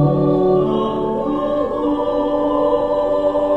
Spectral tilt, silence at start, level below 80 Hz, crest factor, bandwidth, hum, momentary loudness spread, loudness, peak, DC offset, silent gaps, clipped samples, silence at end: -9.5 dB/octave; 0 s; -40 dBFS; 12 dB; 7.8 kHz; none; 5 LU; -18 LUFS; -4 dBFS; under 0.1%; none; under 0.1%; 0 s